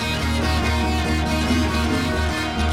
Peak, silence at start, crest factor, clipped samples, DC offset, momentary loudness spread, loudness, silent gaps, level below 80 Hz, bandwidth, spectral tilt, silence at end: -8 dBFS; 0 s; 12 dB; under 0.1%; 0.5%; 2 LU; -21 LUFS; none; -26 dBFS; 15.5 kHz; -5 dB/octave; 0 s